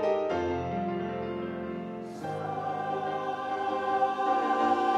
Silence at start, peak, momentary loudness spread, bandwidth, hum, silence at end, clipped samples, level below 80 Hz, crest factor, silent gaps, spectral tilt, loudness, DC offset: 0 s; -14 dBFS; 10 LU; 10 kHz; none; 0 s; under 0.1%; -62 dBFS; 16 dB; none; -6.5 dB/octave; -31 LUFS; under 0.1%